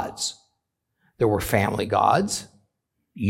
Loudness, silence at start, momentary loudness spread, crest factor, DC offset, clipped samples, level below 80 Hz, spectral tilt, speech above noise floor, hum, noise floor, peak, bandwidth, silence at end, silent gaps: -23 LUFS; 0 s; 10 LU; 20 dB; under 0.1%; under 0.1%; -50 dBFS; -4.5 dB/octave; 56 dB; none; -78 dBFS; -4 dBFS; 17 kHz; 0 s; none